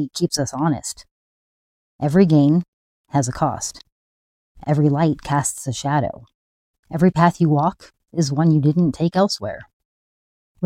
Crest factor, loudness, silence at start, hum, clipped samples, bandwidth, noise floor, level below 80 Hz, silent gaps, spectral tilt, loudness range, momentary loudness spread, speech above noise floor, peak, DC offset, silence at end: 18 dB; -19 LUFS; 0 s; none; under 0.1%; 15 kHz; under -90 dBFS; -52 dBFS; 1.11-1.99 s, 2.68-3.04 s, 3.92-4.55 s, 6.34-6.83 s, 9.73-10.55 s; -6 dB/octave; 3 LU; 14 LU; over 72 dB; -2 dBFS; under 0.1%; 0 s